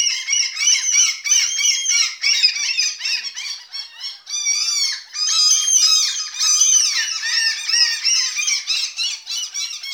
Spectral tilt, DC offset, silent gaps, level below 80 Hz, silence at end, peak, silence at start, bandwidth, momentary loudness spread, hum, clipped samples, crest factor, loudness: 8.5 dB/octave; under 0.1%; none; -80 dBFS; 0 s; -2 dBFS; 0 s; over 20 kHz; 12 LU; none; under 0.1%; 16 dB; -15 LUFS